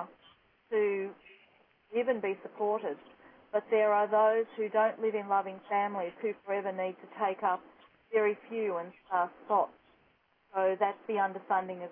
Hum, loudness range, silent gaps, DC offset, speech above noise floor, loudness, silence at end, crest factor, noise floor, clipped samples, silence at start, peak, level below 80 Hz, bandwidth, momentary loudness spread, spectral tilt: none; 4 LU; none; under 0.1%; 38 dB; -32 LUFS; 0 s; 16 dB; -69 dBFS; under 0.1%; 0 s; -16 dBFS; -82 dBFS; 3.7 kHz; 10 LU; -8.5 dB/octave